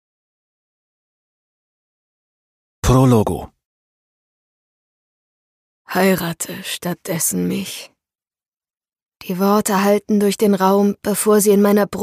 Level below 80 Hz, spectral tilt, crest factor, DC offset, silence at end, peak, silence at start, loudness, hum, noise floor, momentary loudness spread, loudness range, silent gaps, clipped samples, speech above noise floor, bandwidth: -40 dBFS; -5.5 dB/octave; 18 dB; under 0.1%; 0 s; -2 dBFS; 2.85 s; -17 LUFS; none; under -90 dBFS; 12 LU; 8 LU; 3.65-5.85 s, 8.48-8.52 s, 9.02-9.06 s; under 0.1%; over 74 dB; 15.5 kHz